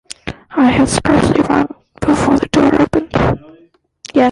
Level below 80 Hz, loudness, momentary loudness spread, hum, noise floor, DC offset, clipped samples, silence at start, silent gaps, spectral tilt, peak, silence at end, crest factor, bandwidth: -34 dBFS; -14 LUFS; 12 LU; none; -49 dBFS; under 0.1%; under 0.1%; 0.25 s; none; -5.5 dB/octave; -2 dBFS; 0 s; 12 dB; 11.5 kHz